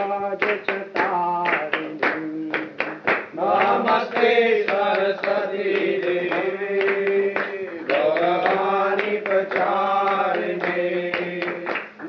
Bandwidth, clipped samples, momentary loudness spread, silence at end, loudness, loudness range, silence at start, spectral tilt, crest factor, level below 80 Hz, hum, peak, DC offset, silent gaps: 6.4 kHz; under 0.1%; 7 LU; 0 s; -22 LUFS; 2 LU; 0 s; -6.5 dB/octave; 16 dB; -78 dBFS; none; -6 dBFS; under 0.1%; none